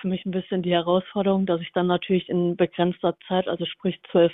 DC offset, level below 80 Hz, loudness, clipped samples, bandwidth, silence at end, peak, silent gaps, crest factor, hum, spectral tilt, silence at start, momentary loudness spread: under 0.1%; -60 dBFS; -24 LUFS; under 0.1%; 4 kHz; 0 s; -6 dBFS; none; 16 dB; none; -10.5 dB/octave; 0 s; 5 LU